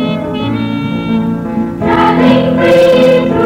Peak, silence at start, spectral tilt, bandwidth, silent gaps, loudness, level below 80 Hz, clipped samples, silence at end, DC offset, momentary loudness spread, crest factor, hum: 0 dBFS; 0 s; -7 dB/octave; 14.5 kHz; none; -10 LUFS; -36 dBFS; under 0.1%; 0 s; under 0.1%; 9 LU; 10 dB; none